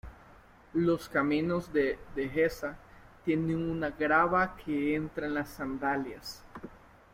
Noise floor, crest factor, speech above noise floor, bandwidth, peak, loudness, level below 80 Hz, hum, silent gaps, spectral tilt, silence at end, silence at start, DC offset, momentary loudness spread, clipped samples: -56 dBFS; 18 dB; 26 dB; 16.5 kHz; -14 dBFS; -31 LUFS; -54 dBFS; none; none; -6.5 dB/octave; 0.35 s; 0.05 s; under 0.1%; 16 LU; under 0.1%